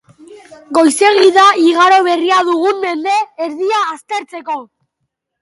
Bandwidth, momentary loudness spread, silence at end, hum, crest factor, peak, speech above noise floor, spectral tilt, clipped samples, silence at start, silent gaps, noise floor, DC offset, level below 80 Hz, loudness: 11.5 kHz; 14 LU; 0.8 s; none; 14 dB; 0 dBFS; 61 dB; -1.5 dB/octave; under 0.1%; 0.3 s; none; -72 dBFS; under 0.1%; -68 dBFS; -12 LUFS